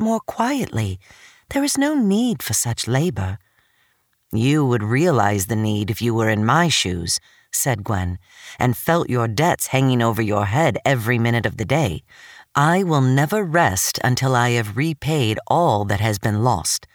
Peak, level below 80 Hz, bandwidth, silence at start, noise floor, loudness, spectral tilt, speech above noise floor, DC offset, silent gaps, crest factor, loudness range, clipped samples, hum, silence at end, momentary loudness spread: -4 dBFS; -48 dBFS; over 20 kHz; 0 s; -64 dBFS; -19 LUFS; -5 dB/octave; 45 dB; under 0.1%; none; 16 dB; 2 LU; under 0.1%; none; 0.1 s; 7 LU